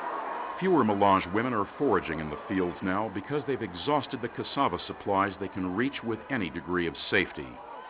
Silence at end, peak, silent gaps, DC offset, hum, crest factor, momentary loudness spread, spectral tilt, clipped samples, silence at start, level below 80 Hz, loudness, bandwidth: 0 s; -10 dBFS; none; under 0.1%; none; 20 dB; 10 LU; -4 dB/octave; under 0.1%; 0 s; -56 dBFS; -29 LUFS; 4 kHz